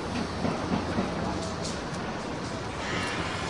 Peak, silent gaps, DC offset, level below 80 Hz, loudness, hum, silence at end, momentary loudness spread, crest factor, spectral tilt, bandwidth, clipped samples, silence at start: -16 dBFS; none; 0.1%; -48 dBFS; -31 LUFS; none; 0 s; 5 LU; 16 dB; -5 dB/octave; 11.5 kHz; under 0.1%; 0 s